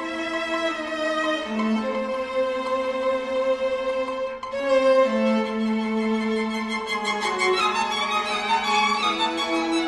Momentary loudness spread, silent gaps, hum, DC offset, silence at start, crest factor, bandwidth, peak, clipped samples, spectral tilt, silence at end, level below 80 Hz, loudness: 6 LU; none; none; under 0.1%; 0 s; 16 dB; 11.5 kHz; -8 dBFS; under 0.1%; -3.5 dB/octave; 0 s; -58 dBFS; -23 LUFS